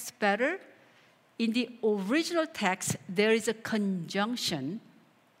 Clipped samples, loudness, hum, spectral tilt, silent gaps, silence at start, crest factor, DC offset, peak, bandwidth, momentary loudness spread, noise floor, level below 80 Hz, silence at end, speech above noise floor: under 0.1%; -30 LUFS; none; -4 dB/octave; none; 0 s; 20 dB; under 0.1%; -10 dBFS; 16 kHz; 9 LU; -62 dBFS; -76 dBFS; 0.6 s; 32 dB